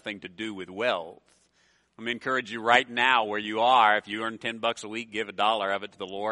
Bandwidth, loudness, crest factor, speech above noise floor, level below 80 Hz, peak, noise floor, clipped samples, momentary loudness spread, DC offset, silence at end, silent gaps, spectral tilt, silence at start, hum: 11.5 kHz; -26 LUFS; 24 dB; 40 dB; -72 dBFS; -2 dBFS; -67 dBFS; under 0.1%; 15 LU; under 0.1%; 0 s; none; -3 dB/octave; 0.05 s; none